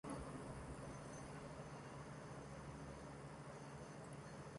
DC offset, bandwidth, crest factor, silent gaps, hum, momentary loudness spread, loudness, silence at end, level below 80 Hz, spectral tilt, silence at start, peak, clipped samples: under 0.1%; 11 kHz; 14 dB; none; none; 3 LU; -54 LUFS; 0 s; -64 dBFS; -5.5 dB/octave; 0.05 s; -38 dBFS; under 0.1%